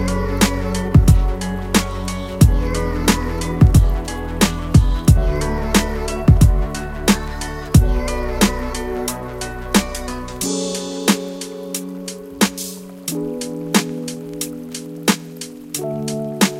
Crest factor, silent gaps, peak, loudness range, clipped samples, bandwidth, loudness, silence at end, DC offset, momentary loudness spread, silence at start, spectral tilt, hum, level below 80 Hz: 18 dB; none; 0 dBFS; 7 LU; under 0.1%; 17 kHz; -19 LUFS; 0 s; under 0.1%; 13 LU; 0 s; -5 dB/octave; none; -22 dBFS